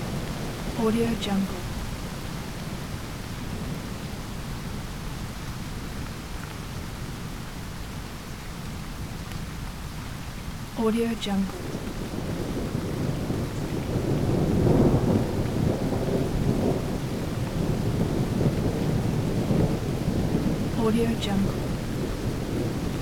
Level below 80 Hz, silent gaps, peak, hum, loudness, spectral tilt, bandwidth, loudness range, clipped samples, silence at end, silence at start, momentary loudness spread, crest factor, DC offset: -38 dBFS; none; -8 dBFS; none; -28 LUFS; -6.5 dB/octave; 18.5 kHz; 11 LU; under 0.1%; 0 s; 0 s; 11 LU; 18 dB; 0.3%